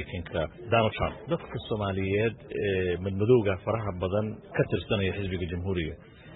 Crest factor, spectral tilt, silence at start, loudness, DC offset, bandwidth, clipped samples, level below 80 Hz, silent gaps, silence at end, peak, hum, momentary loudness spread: 18 dB; -11 dB/octave; 0 s; -29 LUFS; under 0.1%; 4.1 kHz; under 0.1%; -48 dBFS; none; 0 s; -10 dBFS; none; 9 LU